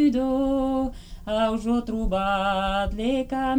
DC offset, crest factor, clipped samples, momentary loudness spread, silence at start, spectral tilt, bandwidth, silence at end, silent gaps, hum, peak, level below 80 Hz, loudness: under 0.1%; 12 dB; under 0.1%; 4 LU; 0 s; -6 dB/octave; 11 kHz; 0 s; none; none; -12 dBFS; -36 dBFS; -25 LUFS